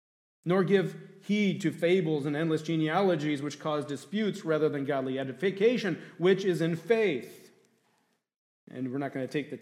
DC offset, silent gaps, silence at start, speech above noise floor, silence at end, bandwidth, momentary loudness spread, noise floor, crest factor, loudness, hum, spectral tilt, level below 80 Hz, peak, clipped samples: under 0.1%; 8.38-8.67 s; 0.45 s; 45 dB; 0.05 s; 14.5 kHz; 9 LU; -74 dBFS; 18 dB; -29 LUFS; none; -6.5 dB/octave; -82 dBFS; -12 dBFS; under 0.1%